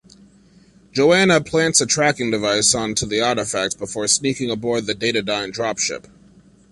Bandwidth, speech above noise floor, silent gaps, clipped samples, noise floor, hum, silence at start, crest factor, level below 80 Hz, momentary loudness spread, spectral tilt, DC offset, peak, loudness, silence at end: 11.5 kHz; 32 dB; none; under 0.1%; -51 dBFS; none; 0.95 s; 20 dB; -52 dBFS; 9 LU; -2.5 dB/octave; under 0.1%; 0 dBFS; -18 LUFS; 0.7 s